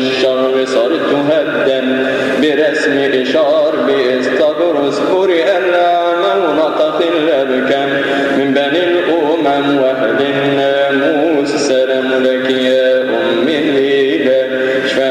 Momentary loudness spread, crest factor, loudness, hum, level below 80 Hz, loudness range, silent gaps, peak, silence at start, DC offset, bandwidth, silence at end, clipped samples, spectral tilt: 2 LU; 10 dB; -12 LUFS; none; -58 dBFS; 1 LU; none; -4 dBFS; 0 s; under 0.1%; 12.5 kHz; 0 s; under 0.1%; -4.5 dB/octave